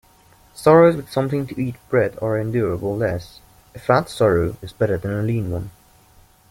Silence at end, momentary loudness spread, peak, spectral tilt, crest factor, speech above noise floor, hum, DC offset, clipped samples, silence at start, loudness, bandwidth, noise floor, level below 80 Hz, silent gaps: 0.8 s; 13 LU; -2 dBFS; -7.5 dB/octave; 18 dB; 33 dB; none; under 0.1%; under 0.1%; 0.55 s; -20 LUFS; 16.5 kHz; -52 dBFS; -48 dBFS; none